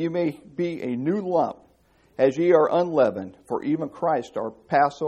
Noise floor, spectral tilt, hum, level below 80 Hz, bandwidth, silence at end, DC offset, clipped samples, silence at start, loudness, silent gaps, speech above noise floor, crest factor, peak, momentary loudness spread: -60 dBFS; -7.5 dB/octave; none; -66 dBFS; 10.5 kHz; 0 s; under 0.1%; under 0.1%; 0 s; -24 LUFS; none; 37 dB; 18 dB; -6 dBFS; 12 LU